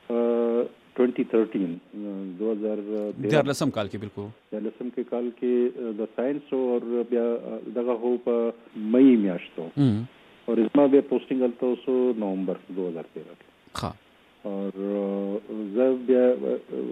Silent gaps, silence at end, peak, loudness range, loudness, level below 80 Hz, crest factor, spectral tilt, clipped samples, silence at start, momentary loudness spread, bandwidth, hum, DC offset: none; 0 s; -8 dBFS; 7 LU; -26 LUFS; -66 dBFS; 18 dB; -7.5 dB/octave; under 0.1%; 0.1 s; 14 LU; 12.5 kHz; none; under 0.1%